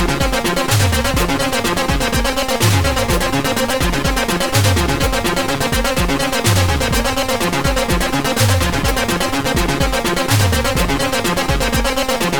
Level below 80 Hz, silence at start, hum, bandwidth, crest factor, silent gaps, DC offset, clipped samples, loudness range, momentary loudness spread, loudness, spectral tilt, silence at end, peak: -24 dBFS; 0 s; none; over 20 kHz; 14 dB; none; under 0.1%; under 0.1%; 0 LU; 3 LU; -16 LUFS; -4 dB/octave; 0 s; -2 dBFS